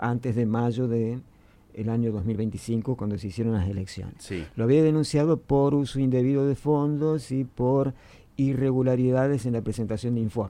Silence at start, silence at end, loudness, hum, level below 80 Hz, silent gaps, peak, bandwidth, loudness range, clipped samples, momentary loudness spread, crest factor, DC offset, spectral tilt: 0 s; 0 s; -25 LUFS; none; -50 dBFS; none; -10 dBFS; 12 kHz; 5 LU; under 0.1%; 9 LU; 16 dB; under 0.1%; -8 dB/octave